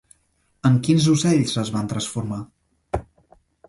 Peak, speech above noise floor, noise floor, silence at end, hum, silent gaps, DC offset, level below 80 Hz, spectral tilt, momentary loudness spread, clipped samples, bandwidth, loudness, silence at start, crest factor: -6 dBFS; 46 dB; -66 dBFS; 0.65 s; none; none; under 0.1%; -46 dBFS; -5.5 dB/octave; 14 LU; under 0.1%; 11.5 kHz; -21 LUFS; 0.65 s; 16 dB